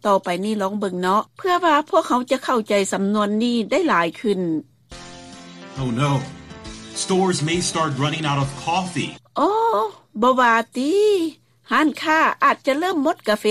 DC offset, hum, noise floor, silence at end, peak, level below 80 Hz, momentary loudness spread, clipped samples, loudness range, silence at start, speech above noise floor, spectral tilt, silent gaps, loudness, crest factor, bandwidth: under 0.1%; none; -40 dBFS; 0 s; -4 dBFS; -54 dBFS; 12 LU; under 0.1%; 5 LU; 0.05 s; 20 dB; -5 dB/octave; none; -20 LUFS; 16 dB; 15 kHz